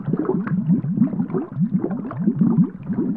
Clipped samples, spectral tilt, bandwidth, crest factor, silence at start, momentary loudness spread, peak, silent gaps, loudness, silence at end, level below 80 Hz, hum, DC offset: under 0.1%; -13.5 dB/octave; 2.8 kHz; 14 dB; 0 s; 6 LU; -6 dBFS; none; -21 LUFS; 0 s; -56 dBFS; none; 0.1%